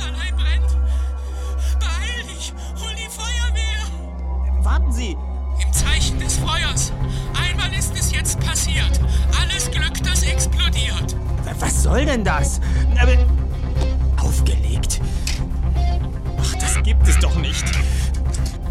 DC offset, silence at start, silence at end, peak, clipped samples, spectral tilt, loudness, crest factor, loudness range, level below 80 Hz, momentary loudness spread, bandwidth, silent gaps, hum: under 0.1%; 0 s; 0 s; -2 dBFS; under 0.1%; -4 dB/octave; -20 LUFS; 16 dB; 5 LU; -20 dBFS; 8 LU; 13.5 kHz; none; none